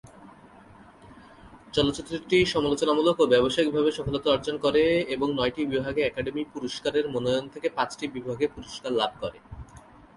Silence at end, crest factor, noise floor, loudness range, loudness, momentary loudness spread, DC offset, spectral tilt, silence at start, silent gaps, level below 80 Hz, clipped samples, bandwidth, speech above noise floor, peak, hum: 0.4 s; 18 dB; -51 dBFS; 6 LU; -26 LUFS; 11 LU; under 0.1%; -5 dB/octave; 0.2 s; none; -52 dBFS; under 0.1%; 11.5 kHz; 25 dB; -8 dBFS; none